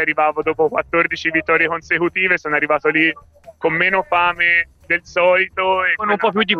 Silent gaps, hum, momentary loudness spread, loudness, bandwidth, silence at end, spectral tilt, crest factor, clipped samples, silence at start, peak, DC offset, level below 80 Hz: none; none; 4 LU; -16 LUFS; 7.2 kHz; 0 s; -5 dB/octave; 16 dB; under 0.1%; 0 s; -2 dBFS; under 0.1%; -52 dBFS